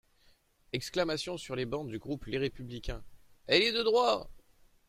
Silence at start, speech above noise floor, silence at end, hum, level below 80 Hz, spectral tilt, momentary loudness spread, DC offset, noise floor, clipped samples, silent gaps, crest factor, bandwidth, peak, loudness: 0.75 s; 34 dB; 0.5 s; none; -52 dBFS; -4.5 dB/octave; 16 LU; under 0.1%; -66 dBFS; under 0.1%; none; 22 dB; 15.5 kHz; -10 dBFS; -32 LUFS